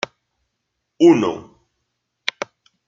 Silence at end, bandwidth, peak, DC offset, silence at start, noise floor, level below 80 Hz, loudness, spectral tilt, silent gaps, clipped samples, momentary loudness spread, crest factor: 1.45 s; 7.4 kHz; 0 dBFS; under 0.1%; 1 s; -76 dBFS; -66 dBFS; -17 LUFS; -5.5 dB/octave; none; under 0.1%; 19 LU; 20 dB